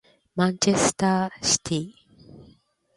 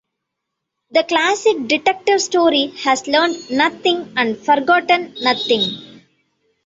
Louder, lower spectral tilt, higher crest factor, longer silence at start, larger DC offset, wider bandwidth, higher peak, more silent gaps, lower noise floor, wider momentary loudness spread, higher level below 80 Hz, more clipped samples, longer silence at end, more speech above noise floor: second, -23 LUFS vs -16 LUFS; about the same, -3.5 dB/octave vs -2.5 dB/octave; about the same, 20 dB vs 16 dB; second, 0.35 s vs 0.95 s; neither; first, 11.5 kHz vs 8 kHz; second, -6 dBFS vs -2 dBFS; neither; second, -58 dBFS vs -79 dBFS; first, 10 LU vs 5 LU; first, -56 dBFS vs -64 dBFS; neither; second, 0.55 s vs 0.7 s; second, 35 dB vs 62 dB